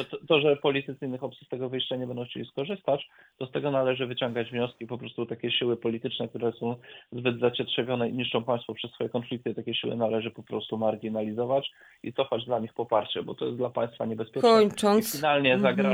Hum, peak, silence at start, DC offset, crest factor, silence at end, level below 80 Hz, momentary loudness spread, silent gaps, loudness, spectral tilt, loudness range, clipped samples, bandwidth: none; -8 dBFS; 0 s; under 0.1%; 20 dB; 0 s; -70 dBFS; 13 LU; none; -28 LUFS; -5 dB/octave; 5 LU; under 0.1%; 19.5 kHz